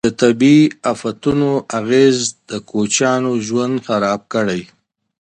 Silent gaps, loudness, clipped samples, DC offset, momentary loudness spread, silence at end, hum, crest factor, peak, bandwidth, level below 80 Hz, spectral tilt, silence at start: none; -16 LUFS; under 0.1%; under 0.1%; 10 LU; 0.55 s; none; 16 dB; 0 dBFS; 9.6 kHz; -52 dBFS; -5 dB/octave; 0.05 s